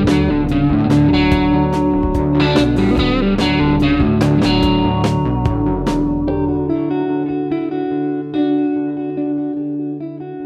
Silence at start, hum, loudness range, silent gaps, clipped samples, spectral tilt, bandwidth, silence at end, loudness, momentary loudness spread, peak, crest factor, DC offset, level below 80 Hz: 0 s; none; 5 LU; none; under 0.1%; -7.5 dB/octave; 10.5 kHz; 0 s; -16 LUFS; 7 LU; 0 dBFS; 16 dB; under 0.1%; -26 dBFS